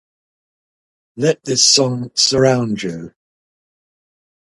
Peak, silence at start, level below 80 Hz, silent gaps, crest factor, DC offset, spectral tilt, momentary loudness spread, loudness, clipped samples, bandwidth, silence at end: 0 dBFS; 1.15 s; -54 dBFS; none; 20 dB; under 0.1%; -3 dB/octave; 13 LU; -14 LUFS; under 0.1%; 11.5 kHz; 1.45 s